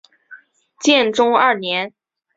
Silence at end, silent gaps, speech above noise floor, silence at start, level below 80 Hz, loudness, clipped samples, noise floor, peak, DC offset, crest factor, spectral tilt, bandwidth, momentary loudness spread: 0.5 s; none; 29 dB; 0.3 s; -66 dBFS; -16 LUFS; under 0.1%; -45 dBFS; 0 dBFS; under 0.1%; 18 dB; -2.5 dB/octave; 8 kHz; 8 LU